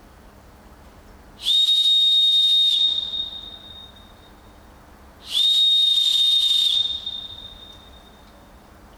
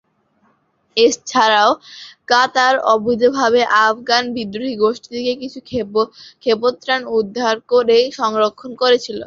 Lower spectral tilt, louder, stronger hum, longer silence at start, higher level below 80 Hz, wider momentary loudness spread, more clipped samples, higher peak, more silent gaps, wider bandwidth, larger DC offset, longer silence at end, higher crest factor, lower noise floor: second, 0.5 dB/octave vs -3 dB/octave; about the same, -16 LUFS vs -16 LUFS; neither; first, 1.4 s vs 0.95 s; first, -52 dBFS vs -58 dBFS; first, 21 LU vs 11 LU; neither; second, -10 dBFS vs 0 dBFS; neither; first, 19.5 kHz vs 7.6 kHz; neither; first, 1.35 s vs 0 s; about the same, 12 dB vs 16 dB; second, -47 dBFS vs -61 dBFS